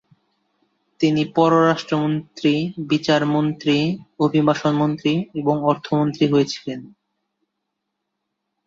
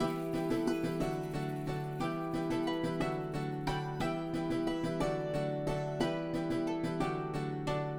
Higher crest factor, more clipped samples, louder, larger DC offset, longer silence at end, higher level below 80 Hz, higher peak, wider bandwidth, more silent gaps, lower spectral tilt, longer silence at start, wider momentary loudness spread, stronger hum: about the same, 18 dB vs 16 dB; neither; first, -20 LUFS vs -35 LUFS; neither; first, 1.8 s vs 0 s; second, -62 dBFS vs -52 dBFS; first, -4 dBFS vs -20 dBFS; second, 7.4 kHz vs 18 kHz; neither; about the same, -6.5 dB/octave vs -6.5 dB/octave; first, 1 s vs 0 s; first, 6 LU vs 3 LU; neither